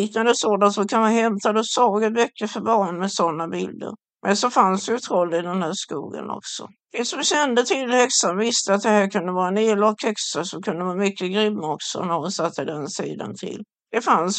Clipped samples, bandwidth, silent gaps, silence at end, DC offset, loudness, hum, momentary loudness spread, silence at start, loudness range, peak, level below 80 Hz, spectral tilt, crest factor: under 0.1%; 9.2 kHz; none; 0 s; under 0.1%; -21 LUFS; none; 12 LU; 0 s; 5 LU; -2 dBFS; -76 dBFS; -3.5 dB/octave; 20 dB